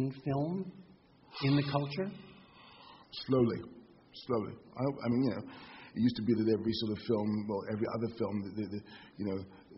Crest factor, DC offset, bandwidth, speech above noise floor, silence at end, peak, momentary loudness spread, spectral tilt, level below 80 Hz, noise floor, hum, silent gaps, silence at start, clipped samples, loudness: 20 dB; under 0.1%; 5.8 kHz; 23 dB; 0 s; -16 dBFS; 19 LU; -6.5 dB/octave; -66 dBFS; -57 dBFS; none; none; 0 s; under 0.1%; -35 LUFS